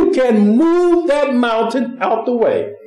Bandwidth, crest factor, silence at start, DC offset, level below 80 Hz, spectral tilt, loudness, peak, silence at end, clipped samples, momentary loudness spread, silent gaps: 10.5 kHz; 12 dB; 0 s; under 0.1%; -52 dBFS; -7 dB/octave; -14 LUFS; -2 dBFS; 0 s; under 0.1%; 6 LU; none